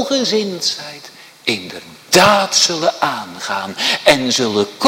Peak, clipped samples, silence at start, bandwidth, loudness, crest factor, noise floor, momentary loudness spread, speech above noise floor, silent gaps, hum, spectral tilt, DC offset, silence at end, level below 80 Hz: 0 dBFS; under 0.1%; 0 s; 18.5 kHz; -15 LUFS; 16 dB; -39 dBFS; 15 LU; 23 dB; none; none; -2.5 dB/octave; under 0.1%; 0 s; -52 dBFS